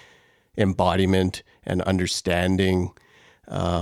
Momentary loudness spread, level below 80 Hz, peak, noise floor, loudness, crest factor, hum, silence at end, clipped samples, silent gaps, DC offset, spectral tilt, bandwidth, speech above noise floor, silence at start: 12 LU; -46 dBFS; -4 dBFS; -57 dBFS; -23 LUFS; 20 dB; none; 0 s; under 0.1%; none; under 0.1%; -5.5 dB/octave; 14 kHz; 34 dB; 0.55 s